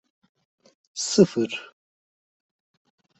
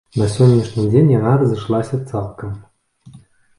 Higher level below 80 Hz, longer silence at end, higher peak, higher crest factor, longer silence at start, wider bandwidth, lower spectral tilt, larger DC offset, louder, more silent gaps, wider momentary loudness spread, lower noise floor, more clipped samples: second, -66 dBFS vs -44 dBFS; first, 1.55 s vs 0.4 s; second, -4 dBFS vs 0 dBFS; first, 24 dB vs 16 dB; first, 0.95 s vs 0.15 s; second, 8.4 kHz vs 11 kHz; second, -4.5 dB/octave vs -8.5 dB/octave; neither; second, -22 LUFS vs -16 LUFS; neither; about the same, 16 LU vs 16 LU; first, under -90 dBFS vs -45 dBFS; neither